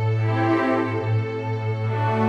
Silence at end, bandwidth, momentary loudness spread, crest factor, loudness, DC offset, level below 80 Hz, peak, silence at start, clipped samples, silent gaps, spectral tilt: 0 s; 6 kHz; 6 LU; 14 dB; -23 LUFS; under 0.1%; -64 dBFS; -8 dBFS; 0 s; under 0.1%; none; -8.5 dB/octave